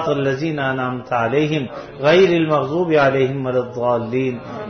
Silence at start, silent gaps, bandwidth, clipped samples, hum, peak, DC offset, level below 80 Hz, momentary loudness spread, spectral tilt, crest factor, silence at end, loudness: 0 s; none; 6.6 kHz; under 0.1%; none; -4 dBFS; under 0.1%; -54 dBFS; 8 LU; -7 dB/octave; 14 dB; 0 s; -18 LUFS